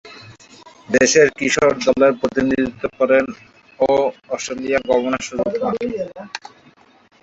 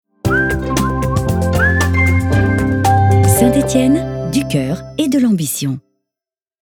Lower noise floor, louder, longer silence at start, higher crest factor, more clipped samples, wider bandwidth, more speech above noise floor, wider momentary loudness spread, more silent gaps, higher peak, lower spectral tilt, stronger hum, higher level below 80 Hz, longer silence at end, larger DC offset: second, -51 dBFS vs -89 dBFS; second, -18 LUFS vs -14 LUFS; second, 0.05 s vs 0.25 s; about the same, 18 dB vs 14 dB; neither; second, 8.2 kHz vs 18.5 kHz; second, 33 dB vs 74 dB; first, 15 LU vs 7 LU; neither; about the same, -2 dBFS vs 0 dBFS; second, -3.5 dB/octave vs -6 dB/octave; neither; second, -52 dBFS vs -28 dBFS; about the same, 0.85 s vs 0.85 s; neither